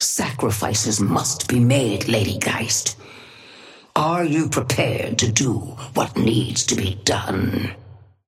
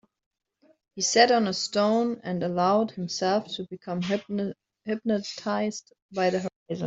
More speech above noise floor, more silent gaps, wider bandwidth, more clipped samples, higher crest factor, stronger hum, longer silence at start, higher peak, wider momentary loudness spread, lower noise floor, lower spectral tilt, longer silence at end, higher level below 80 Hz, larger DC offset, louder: second, 24 dB vs 39 dB; second, none vs 6.02-6.09 s, 6.56-6.66 s; first, 16 kHz vs 8 kHz; neither; about the same, 18 dB vs 22 dB; neither; second, 0 s vs 0.95 s; about the same, -4 dBFS vs -4 dBFS; second, 7 LU vs 14 LU; second, -45 dBFS vs -65 dBFS; about the same, -4 dB/octave vs -4 dB/octave; first, 0.3 s vs 0 s; first, -52 dBFS vs -70 dBFS; neither; first, -20 LUFS vs -26 LUFS